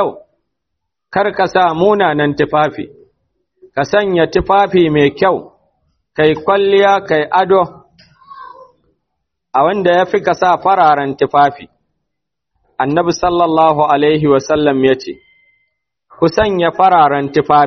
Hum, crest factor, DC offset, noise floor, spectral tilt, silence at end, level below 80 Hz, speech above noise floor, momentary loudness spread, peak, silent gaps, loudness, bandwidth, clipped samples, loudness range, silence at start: none; 14 dB; under 0.1%; -77 dBFS; -4 dB/octave; 0 s; -44 dBFS; 66 dB; 9 LU; 0 dBFS; none; -13 LUFS; 6.4 kHz; under 0.1%; 3 LU; 0 s